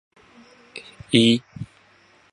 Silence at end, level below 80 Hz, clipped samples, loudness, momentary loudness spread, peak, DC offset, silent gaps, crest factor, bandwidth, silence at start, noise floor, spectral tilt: 0.65 s; -58 dBFS; under 0.1%; -19 LUFS; 23 LU; 0 dBFS; under 0.1%; none; 24 dB; 11.5 kHz; 0.75 s; -56 dBFS; -5 dB/octave